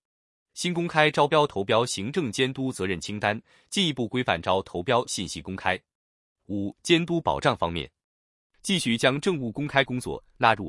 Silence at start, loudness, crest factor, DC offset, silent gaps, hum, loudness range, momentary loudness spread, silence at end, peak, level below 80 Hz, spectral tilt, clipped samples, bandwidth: 0.55 s; -26 LUFS; 22 dB; under 0.1%; 5.95-6.36 s, 8.04-8.50 s; none; 3 LU; 11 LU; 0 s; -4 dBFS; -58 dBFS; -4.5 dB/octave; under 0.1%; 12 kHz